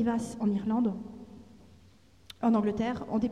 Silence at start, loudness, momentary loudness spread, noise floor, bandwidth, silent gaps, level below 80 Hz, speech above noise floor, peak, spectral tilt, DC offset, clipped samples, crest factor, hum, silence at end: 0 s; -30 LUFS; 21 LU; -59 dBFS; 11.5 kHz; none; -58 dBFS; 31 dB; -16 dBFS; -7 dB/octave; under 0.1%; under 0.1%; 14 dB; none; 0 s